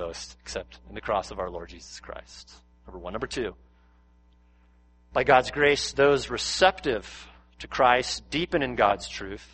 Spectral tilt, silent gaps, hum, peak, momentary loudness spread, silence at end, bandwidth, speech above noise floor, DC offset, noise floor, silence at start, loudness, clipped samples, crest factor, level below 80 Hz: -3.5 dB/octave; none; none; -4 dBFS; 21 LU; 0.1 s; 8.8 kHz; 32 dB; under 0.1%; -59 dBFS; 0 s; -25 LUFS; under 0.1%; 24 dB; -48 dBFS